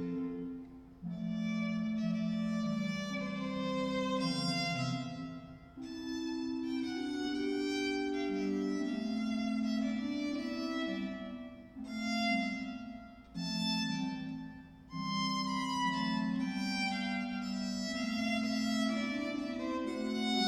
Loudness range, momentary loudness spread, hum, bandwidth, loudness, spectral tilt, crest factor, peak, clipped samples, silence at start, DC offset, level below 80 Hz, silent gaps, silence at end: 3 LU; 11 LU; none; 13.5 kHz; -36 LUFS; -5 dB/octave; 16 dB; -20 dBFS; under 0.1%; 0 s; under 0.1%; -64 dBFS; none; 0 s